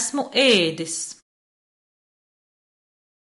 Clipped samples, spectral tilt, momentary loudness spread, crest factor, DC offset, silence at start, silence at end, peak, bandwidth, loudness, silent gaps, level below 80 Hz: under 0.1%; -2.5 dB/octave; 13 LU; 22 dB; under 0.1%; 0 s; 2.1 s; -4 dBFS; 11.5 kHz; -20 LUFS; none; -74 dBFS